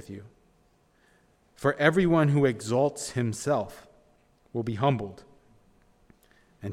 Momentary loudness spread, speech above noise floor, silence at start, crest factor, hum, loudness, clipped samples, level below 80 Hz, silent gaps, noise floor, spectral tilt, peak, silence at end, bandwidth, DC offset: 18 LU; 39 dB; 0.1 s; 22 dB; none; -26 LUFS; under 0.1%; -60 dBFS; none; -65 dBFS; -6 dB/octave; -6 dBFS; 0 s; 14.5 kHz; under 0.1%